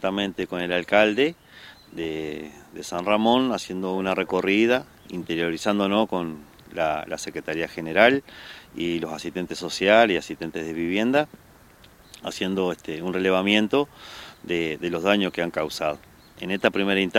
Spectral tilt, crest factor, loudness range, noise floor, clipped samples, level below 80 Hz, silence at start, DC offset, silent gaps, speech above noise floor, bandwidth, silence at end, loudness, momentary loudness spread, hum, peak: -5 dB/octave; 24 dB; 3 LU; -51 dBFS; under 0.1%; -58 dBFS; 0 s; under 0.1%; none; 28 dB; 16.5 kHz; 0 s; -24 LUFS; 18 LU; none; 0 dBFS